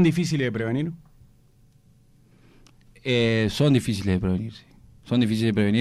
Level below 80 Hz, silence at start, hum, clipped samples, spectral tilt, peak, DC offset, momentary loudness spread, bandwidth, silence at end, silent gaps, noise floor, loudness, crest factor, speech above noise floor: -50 dBFS; 0 s; none; under 0.1%; -6.5 dB/octave; -10 dBFS; under 0.1%; 11 LU; 14 kHz; 0 s; none; -57 dBFS; -24 LUFS; 14 dB; 34 dB